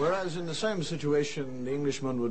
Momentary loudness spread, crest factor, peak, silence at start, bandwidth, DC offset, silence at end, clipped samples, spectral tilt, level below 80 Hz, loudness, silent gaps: 5 LU; 14 dB; -16 dBFS; 0 s; 8.8 kHz; 0.9%; 0 s; under 0.1%; -5.5 dB/octave; -58 dBFS; -31 LUFS; none